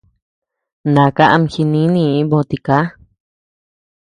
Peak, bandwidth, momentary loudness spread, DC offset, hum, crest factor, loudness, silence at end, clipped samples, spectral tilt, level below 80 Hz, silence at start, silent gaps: 0 dBFS; 9.8 kHz; 6 LU; under 0.1%; none; 16 dB; -14 LUFS; 1.25 s; under 0.1%; -8 dB/octave; -50 dBFS; 0.85 s; none